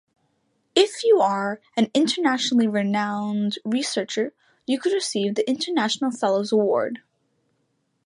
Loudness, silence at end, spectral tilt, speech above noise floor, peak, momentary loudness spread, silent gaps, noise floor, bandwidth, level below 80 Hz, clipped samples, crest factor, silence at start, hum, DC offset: -22 LUFS; 1.05 s; -4 dB/octave; 49 dB; -4 dBFS; 8 LU; none; -71 dBFS; 11.5 kHz; -74 dBFS; under 0.1%; 20 dB; 0.75 s; none; under 0.1%